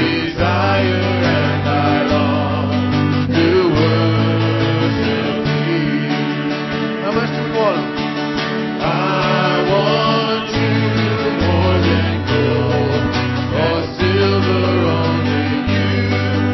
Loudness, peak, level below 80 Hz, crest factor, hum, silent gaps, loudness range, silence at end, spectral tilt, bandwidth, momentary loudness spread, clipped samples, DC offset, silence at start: -16 LUFS; -4 dBFS; -32 dBFS; 12 dB; none; none; 3 LU; 0 s; -7 dB/octave; 6.2 kHz; 4 LU; under 0.1%; under 0.1%; 0 s